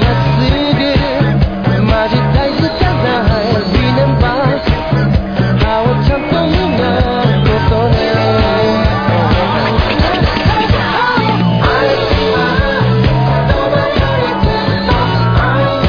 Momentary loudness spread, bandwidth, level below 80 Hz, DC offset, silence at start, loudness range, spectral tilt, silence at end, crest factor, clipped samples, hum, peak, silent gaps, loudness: 2 LU; 5.4 kHz; -20 dBFS; under 0.1%; 0 s; 1 LU; -8 dB/octave; 0 s; 12 dB; under 0.1%; none; 0 dBFS; none; -12 LUFS